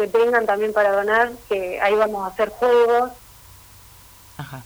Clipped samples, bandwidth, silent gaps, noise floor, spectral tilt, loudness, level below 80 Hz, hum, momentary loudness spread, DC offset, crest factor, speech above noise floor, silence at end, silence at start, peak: under 0.1%; over 20 kHz; none; -46 dBFS; -4.5 dB/octave; -19 LUFS; -54 dBFS; none; 9 LU; under 0.1%; 16 dB; 27 dB; 0.05 s; 0 s; -4 dBFS